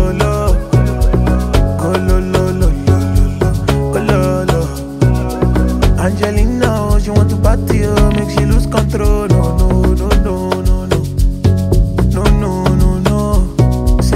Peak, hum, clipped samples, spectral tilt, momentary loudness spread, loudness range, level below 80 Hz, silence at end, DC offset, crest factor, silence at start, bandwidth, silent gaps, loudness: 0 dBFS; none; under 0.1%; -7 dB/octave; 3 LU; 1 LU; -16 dBFS; 0 s; under 0.1%; 12 dB; 0 s; 15 kHz; none; -14 LUFS